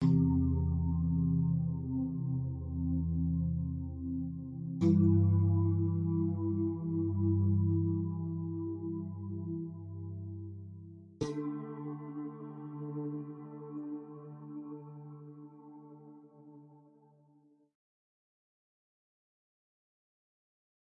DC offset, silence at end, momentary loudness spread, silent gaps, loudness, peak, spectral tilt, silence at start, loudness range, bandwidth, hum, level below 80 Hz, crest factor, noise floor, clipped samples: under 0.1%; 4.05 s; 20 LU; none; -34 LUFS; -16 dBFS; -11 dB/octave; 0 s; 17 LU; 6.2 kHz; none; -54 dBFS; 18 dB; -67 dBFS; under 0.1%